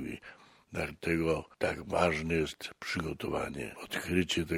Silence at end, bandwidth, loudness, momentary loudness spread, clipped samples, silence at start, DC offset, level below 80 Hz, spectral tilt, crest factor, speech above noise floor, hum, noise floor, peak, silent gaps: 0 s; 16.5 kHz; -33 LUFS; 12 LU; under 0.1%; 0 s; under 0.1%; -54 dBFS; -5 dB/octave; 22 dB; 22 dB; none; -55 dBFS; -12 dBFS; none